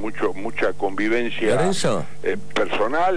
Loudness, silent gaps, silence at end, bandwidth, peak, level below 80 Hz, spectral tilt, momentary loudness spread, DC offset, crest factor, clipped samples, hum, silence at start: -23 LUFS; none; 0 s; 10.5 kHz; -8 dBFS; -50 dBFS; -4.5 dB/octave; 6 LU; 6%; 14 dB; under 0.1%; 50 Hz at -45 dBFS; 0 s